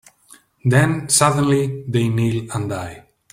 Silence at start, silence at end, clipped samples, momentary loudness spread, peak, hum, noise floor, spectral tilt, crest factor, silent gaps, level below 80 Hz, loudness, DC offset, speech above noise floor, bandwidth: 0.65 s; 0.35 s; under 0.1%; 11 LU; -2 dBFS; none; -51 dBFS; -5 dB/octave; 18 dB; none; -50 dBFS; -18 LUFS; under 0.1%; 33 dB; 16 kHz